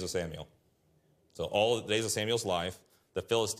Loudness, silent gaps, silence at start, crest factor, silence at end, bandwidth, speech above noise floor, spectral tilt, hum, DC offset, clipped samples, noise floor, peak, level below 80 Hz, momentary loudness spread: -32 LUFS; none; 0 s; 18 dB; 0 s; 15.5 kHz; 38 dB; -3.5 dB/octave; none; under 0.1%; under 0.1%; -70 dBFS; -14 dBFS; -66 dBFS; 13 LU